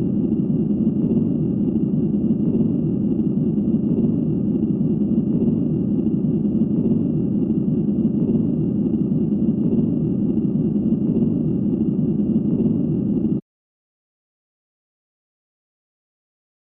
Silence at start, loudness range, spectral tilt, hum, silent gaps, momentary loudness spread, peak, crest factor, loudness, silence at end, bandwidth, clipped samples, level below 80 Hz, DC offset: 0 s; 3 LU; -15 dB/octave; none; none; 2 LU; -8 dBFS; 12 dB; -20 LUFS; 3.2 s; 3 kHz; under 0.1%; -44 dBFS; under 0.1%